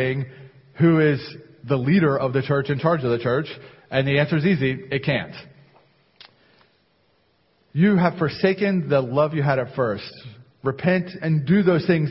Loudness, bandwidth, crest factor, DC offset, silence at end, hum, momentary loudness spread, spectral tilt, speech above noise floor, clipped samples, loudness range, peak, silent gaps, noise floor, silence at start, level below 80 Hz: -21 LUFS; 5.8 kHz; 18 dB; under 0.1%; 0 s; none; 13 LU; -12 dB/octave; 43 dB; under 0.1%; 5 LU; -4 dBFS; none; -64 dBFS; 0 s; -56 dBFS